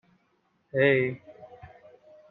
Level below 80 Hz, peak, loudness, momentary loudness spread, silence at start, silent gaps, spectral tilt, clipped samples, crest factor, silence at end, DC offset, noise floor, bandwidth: -70 dBFS; -10 dBFS; -25 LUFS; 26 LU; 0.75 s; none; -5 dB/octave; under 0.1%; 20 dB; 0.65 s; under 0.1%; -71 dBFS; 4.2 kHz